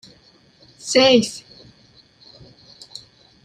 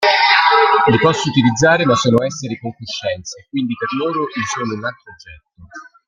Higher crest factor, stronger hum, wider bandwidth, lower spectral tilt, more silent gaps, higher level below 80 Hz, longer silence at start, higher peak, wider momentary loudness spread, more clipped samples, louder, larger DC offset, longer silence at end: first, 22 dB vs 16 dB; neither; first, 14 kHz vs 9.8 kHz; second, -3 dB/octave vs -4.5 dB/octave; neither; second, -60 dBFS vs -52 dBFS; first, 0.85 s vs 0 s; about the same, -2 dBFS vs 0 dBFS; first, 25 LU vs 14 LU; neither; about the same, -16 LUFS vs -15 LUFS; neither; first, 2.05 s vs 0.25 s